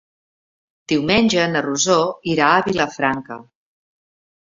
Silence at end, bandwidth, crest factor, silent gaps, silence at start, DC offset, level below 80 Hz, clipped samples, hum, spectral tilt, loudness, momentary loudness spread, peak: 1.15 s; 7.8 kHz; 20 dB; none; 0.9 s; under 0.1%; -52 dBFS; under 0.1%; none; -3.5 dB/octave; -18 LUFS; 9 LU; 0 dBFS